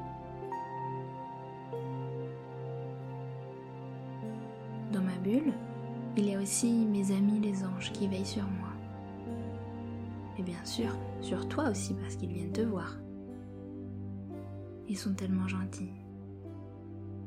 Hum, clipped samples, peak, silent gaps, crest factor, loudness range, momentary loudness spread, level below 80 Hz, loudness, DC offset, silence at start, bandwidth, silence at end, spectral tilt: none; under 0.1%; -18 dBFS; none; 18 dB; 9 LU; 15 LU; -62 dBFS; -36 LUFS; under 0.1%; 0 s; 15 kHz; 0 s; -6 dB/octave